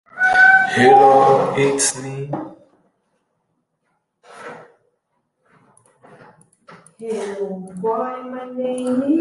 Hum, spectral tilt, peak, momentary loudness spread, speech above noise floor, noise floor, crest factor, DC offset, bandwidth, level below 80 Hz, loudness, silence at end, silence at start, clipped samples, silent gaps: none; -3.5 dB/octave; -2 dBFS; 24 LU; 54 dB; -71 dBFS; 18 dB; under 0.1%; 11.5 kHz; -62 dBFS; -16 LUFS; 0 s; 0.15 s; under 0.1%; none